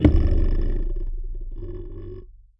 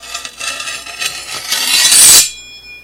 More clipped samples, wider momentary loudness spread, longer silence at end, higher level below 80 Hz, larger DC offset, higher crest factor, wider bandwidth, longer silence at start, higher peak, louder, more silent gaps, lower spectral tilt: second, under 0.1% vs 1%; about the same, 17 LU vs 19 LU; first, 0.25 s vs 0.05 s; first, -24 dBFS vs -48 dBFS; neither; first, 20 dB vs 12 dB; second, 5.6 kHz vs over 20 kHz; about the same, 0 s vs 0 s; about the same, -2 dBFS vs 0 dBFS; second, -27 LUFS vs -7 LUFS; neither; first, -10.5 dB/octave vs 2.5 dB/octave